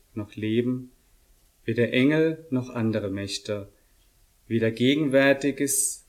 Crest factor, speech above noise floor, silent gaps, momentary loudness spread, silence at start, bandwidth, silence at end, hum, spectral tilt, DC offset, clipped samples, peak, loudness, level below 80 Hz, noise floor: 18 dB; 37 dB; none; 13 LU; 0.15 s; 16 kHz; 0.1 s; none; -4.5 dB/octave; under 0.1%; under 0.1%; -8 dBFS; -25 LUFS; -58 dBFS; -61 dBFS